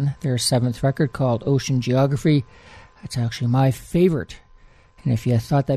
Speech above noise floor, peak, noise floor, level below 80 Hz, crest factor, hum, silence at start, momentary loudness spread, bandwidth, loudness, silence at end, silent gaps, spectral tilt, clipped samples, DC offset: 30 dB; -6 dBFS; -50 dBFS; -46 dBFS; 14 dB; none; 0 s; 9 LU; 14 kHz; -21 LUFS; 0 s; none; -6.5 dB/octave; under 0.1%; under 0.1%